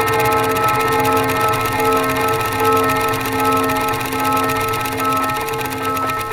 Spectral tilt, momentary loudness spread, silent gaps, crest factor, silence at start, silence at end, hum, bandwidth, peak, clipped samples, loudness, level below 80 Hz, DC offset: -4 dB/octave; 4 LU; none; 14 dB; 0 s; 0 s; none; over 20 kHz; -2 dBFS; under 0.1%; -17 LUFS; -42 dBFS; under 0.1%